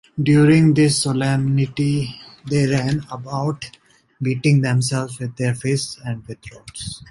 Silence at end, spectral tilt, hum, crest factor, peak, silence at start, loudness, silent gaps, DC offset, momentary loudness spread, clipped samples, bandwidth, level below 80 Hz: 0.15 s; -6 dB/octave; none; 16 dB; -4 dBFS; 0.15 s; -19 LUFS; none; under 0.1%; 18 LU; under 0.1%; 11.5 kHz; -50 dBFS